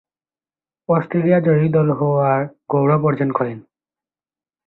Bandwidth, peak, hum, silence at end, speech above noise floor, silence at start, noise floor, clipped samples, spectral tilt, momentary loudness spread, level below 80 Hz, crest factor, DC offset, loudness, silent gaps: 4.1 kHz; -4 dBFS; none; 1.05 s; over 73 dB; 0.9 s; under -90 dBFS; under 0.1%; -13 dB/octave; 8 LU; -58 dBFS; 16 dB; under 0.1%; -18 LUFS; none